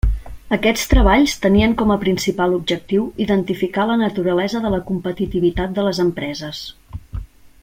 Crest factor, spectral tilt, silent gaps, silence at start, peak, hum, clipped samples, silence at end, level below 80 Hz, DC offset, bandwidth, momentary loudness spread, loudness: 16 dB; -5.5 dB/octave; none; 0.05 s; -2 dBFS; none; under 0.1%; 0.15 s; -26 dBFS; under 0.1%; 16.5 kHz; 15 LU; -18 LUFS